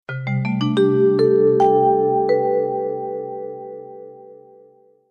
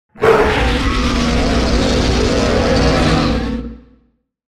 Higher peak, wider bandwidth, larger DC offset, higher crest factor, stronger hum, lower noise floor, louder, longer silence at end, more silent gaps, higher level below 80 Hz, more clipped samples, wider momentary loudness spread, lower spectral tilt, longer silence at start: second, -6 dBFS vs 0 dBFS; second, 8.6 kHz vs 12.5 kHz; neither; about the same, 14 dB vs 14 dB; neither; second, -52 dBFS vs -58 dBFS; second, -18 LUFS vs -15 LUFS; about the same, 0.75 s vs 0.75 s; neither; second, -66 dBFS vs -22 dBFS; neither; first, 19 LU vs 6 LU; first, -8.5 dB/octave vs -5.5 dB/octave; about the same, 0.1 s vs 0.15 s